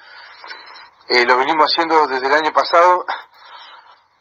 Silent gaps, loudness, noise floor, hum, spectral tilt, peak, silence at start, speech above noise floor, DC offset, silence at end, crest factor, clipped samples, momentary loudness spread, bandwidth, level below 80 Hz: none; -14 LUFS; -45 dBFS; none; -2.5 dB/octave; 0 dBFS; 0.15 s; 30 dB; under 0.1%; 0.55 s; 18 dB; under 0.1%; 22 LU; 8 kHz; -70 dBFS